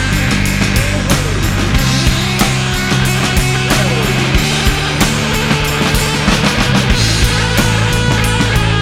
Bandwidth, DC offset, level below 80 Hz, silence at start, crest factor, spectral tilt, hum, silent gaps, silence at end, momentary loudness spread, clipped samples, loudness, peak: 17 kHz; under 0.1%; -20 dBFS; 0 s; 12 dB; -4 dB/octave; none; none; 0 s; 2 LU; under 0.1%; -13 LUFS; 0 dBFS